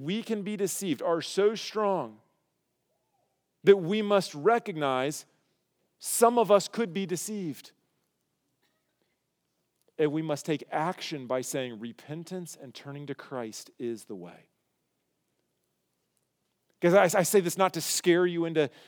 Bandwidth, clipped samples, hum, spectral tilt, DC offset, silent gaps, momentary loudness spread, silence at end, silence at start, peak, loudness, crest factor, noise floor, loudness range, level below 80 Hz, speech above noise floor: over 20 kHz; under 0.1%; none; -4.5 dB/octave; under 0.1%; none; 17 LU; 0.2 s; 0 s; -8 dBFS; -27 LUFS; 22 dB; -79 dBFS; 14 LU; under -90 dBFS; 51 dB